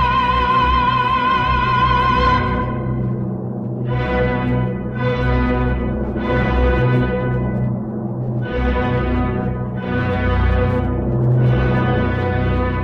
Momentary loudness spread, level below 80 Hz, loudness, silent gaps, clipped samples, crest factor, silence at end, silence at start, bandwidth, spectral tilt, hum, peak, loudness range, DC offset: 7 LU; -26 dBFS; -18 LUFS; none; under 0.1%; 12 dB; 0 s; 0 s; 6.2 kHz; -8.5 dB/octave; none; -4 dBFS; 3 LU; under 0.1%